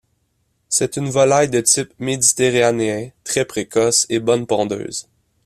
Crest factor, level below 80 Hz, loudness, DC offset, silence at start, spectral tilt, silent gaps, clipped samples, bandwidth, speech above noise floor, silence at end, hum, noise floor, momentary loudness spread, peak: 18 dB; -56 dBFS; -17 LUFS; under 0.1%; 0.7 s; -3 dB/octave; none; under 0.1%; 14.5 kHz; 49 dB; 0.45 s; none; -66 dBFS; 9 LU; 0 dBFS